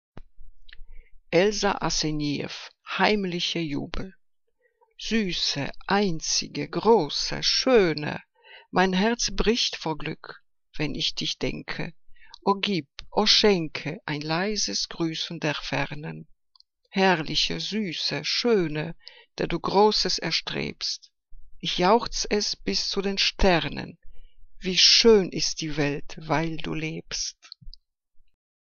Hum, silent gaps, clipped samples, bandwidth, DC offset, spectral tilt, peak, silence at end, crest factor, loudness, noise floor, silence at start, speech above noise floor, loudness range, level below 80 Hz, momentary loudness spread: none; none; under 0.1%; 7.4 kHz; under 0.1%; -3.5 dB/octave; -4 dBFS; 0.5 s; 22 dB; -24 LUFS; -70 dBFS; 0.15 s; 45 dB; 6 LU; -42 dBFS; 13 LU